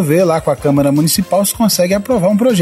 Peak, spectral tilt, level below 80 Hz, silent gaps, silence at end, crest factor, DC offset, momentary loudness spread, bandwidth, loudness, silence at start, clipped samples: 0 dBFS; -5 dB/octave; -42 dBFS; none; 0 s; 12 dB; under 0.1%; 2 LU; 16 kHz; -13 LUFS; 0 s; under 0.1%